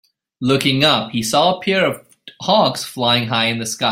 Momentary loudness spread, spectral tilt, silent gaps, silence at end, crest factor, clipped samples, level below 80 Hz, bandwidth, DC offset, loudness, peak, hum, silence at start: 6 LU; -4 dB/octave; none; 0 s; 16 dB; under 0.1%; -56 dBFS; 16.5 kHz; under 0.1%; -16 LUFS; -2 dBFS; none; 0.4 s